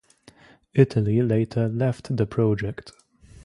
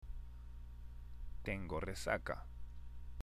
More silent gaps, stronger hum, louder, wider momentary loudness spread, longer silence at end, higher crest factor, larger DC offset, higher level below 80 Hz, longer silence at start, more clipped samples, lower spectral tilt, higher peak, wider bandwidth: neither; second, none vs 60 Hz at -55 dBFS; first, -23 LUFS vs -46 LUFS; second, 8 LU vs 15 LU; first, 0.55 s vs 0 s; about the same, 20 dB vs 24 dB; second, under 0.1% vs 0.1%; about the same, -52 dBFS vs -50 dBFS; first, 0.75 s vs 0 s; neither; first, -9 dB/octave vs -5 dB/octave; first, -4 dBFS vs -22 dBFS; second, 11 kHz vs 15.5 kHz